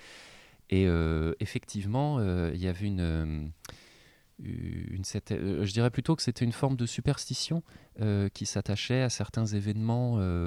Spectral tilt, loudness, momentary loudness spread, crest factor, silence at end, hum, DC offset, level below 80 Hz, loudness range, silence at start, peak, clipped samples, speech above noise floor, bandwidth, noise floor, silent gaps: -6 dB/octave; -31 LUFS; 9 LU; 18 dB; 0 s; none; under 0.1%; -48 dBFS; 4 LU; 0 s; -12 dBFS; under 0.1%; 30 dB; 13.5 kHz; -60 dBFS; none